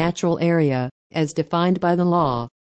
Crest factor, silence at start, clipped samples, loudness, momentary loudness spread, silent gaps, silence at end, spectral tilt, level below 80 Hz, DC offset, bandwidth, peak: 14 dB; 0 s; under 0.1%; -21 LUFS; 6 LU; 0.91-1.10 s; 0.2 s; -7 dB/octave; -54 dBFS; under 0.1%; 8.4 kHz; -8 dBFS